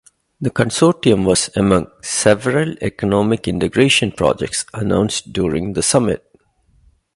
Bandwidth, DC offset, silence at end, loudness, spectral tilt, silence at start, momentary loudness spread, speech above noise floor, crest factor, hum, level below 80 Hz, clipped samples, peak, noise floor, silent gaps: 11.5 kHz; under 0.1%; 1 s; -17 LUFS; -4.5 dB/octave; 0.4 s; 8 LU; 40 dB; 18 dB; none; -40 dBFS; under 0.1%; 0 dBFS; -56 dBFS; none